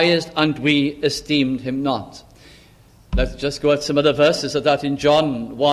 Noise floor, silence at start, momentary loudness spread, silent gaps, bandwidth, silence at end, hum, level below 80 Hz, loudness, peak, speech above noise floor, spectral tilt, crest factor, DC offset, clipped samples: -49 dBFS; 0 s; 7 LU; none; 13 kHz; 0 s; none; -34 dBFS; -19 LUFS; -2 dBFS; 31 dB; -5 dB/octave; 16 dB; under 0.1%; under 0.1%